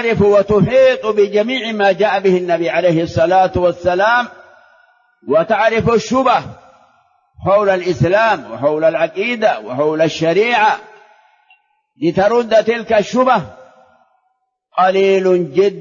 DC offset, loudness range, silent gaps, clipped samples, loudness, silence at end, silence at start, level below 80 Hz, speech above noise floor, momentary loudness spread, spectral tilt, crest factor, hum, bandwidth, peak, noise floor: under 0.1%; 3 LU; none; under 0.1%; -14 LUFS; 0 s; 0 s; -46 dBFS; 53 dB; 6 LU; -6 dB/octave; 12 dB; none; 7.4 kHz; -2 dBFS; -67 dBFS